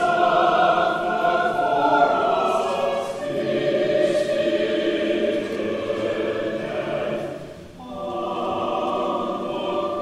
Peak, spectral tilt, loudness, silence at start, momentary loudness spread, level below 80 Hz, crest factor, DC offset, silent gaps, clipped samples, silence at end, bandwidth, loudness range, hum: -6 dBFS; -5.5 dB/octave; -22 LUFS; 0 s; 9 LU; -56 dBFS; 16 dB; under 0.1%; none; under 0.1%; 0 s; 13 kHz; 6 LU; none